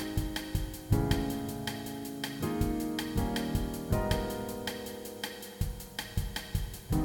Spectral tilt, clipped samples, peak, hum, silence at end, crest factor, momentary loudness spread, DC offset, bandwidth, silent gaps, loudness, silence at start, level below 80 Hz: -5.5 dB/octave; under 0.1%; -14 dBFS; none; 0 s; 20 dB; 8 LU; under 0.1%; 17.5 kHz; none; -35 LUFS; 0 s; -40 dBFS